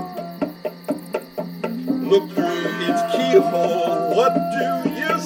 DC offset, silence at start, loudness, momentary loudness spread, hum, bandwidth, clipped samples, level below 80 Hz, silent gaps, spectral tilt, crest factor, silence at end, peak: under 0.1%; 0 s; -21 LUFS; 12 LU; none; 17 kHz; under 0.1%; -64 dBFS; none; -5.5 dB/octave; 18 dB; 0 s; -2 dBFS